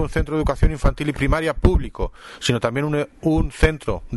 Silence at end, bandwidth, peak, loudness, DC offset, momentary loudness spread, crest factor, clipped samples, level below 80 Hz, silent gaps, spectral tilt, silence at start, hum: 0 s; 11.5 kHz; -4 dBFS; -22 LUFS; under 0.1%; 7 LU; 16 dB; under 0.1%; -24 dBFS; none; -6 dB/octave; 0 s; none